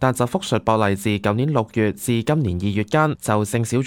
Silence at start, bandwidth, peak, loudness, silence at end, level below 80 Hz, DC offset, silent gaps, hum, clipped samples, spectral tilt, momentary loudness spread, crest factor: 0 s; 17 kHz; -2 dBFS; -20 LUFS; 0 s; -48 dBFS; under 0.1%; none; none; under 0.1%; -6 dB/octave; 3 LU; 18 dB